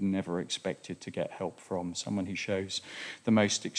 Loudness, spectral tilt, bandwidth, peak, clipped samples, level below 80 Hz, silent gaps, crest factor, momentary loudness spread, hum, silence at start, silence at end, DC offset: -33 LUFS; -4.5 dB/octave; 10.5 kHz; -12 dBFS; under 0.1%; -72 dBFS; none; 20 dB; 12 LU; none; 0 s; 0 s; under 0.1%